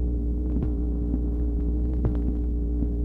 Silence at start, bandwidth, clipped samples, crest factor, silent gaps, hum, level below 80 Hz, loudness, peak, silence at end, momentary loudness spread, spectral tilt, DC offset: 0 s; 1.7 kHz; under 0.1%; 12 dB; none; none; -26 dBFS; -28 LUFS; -12 dBFS; 0 s; 2 LU; -12 dB/octave; under 0.1%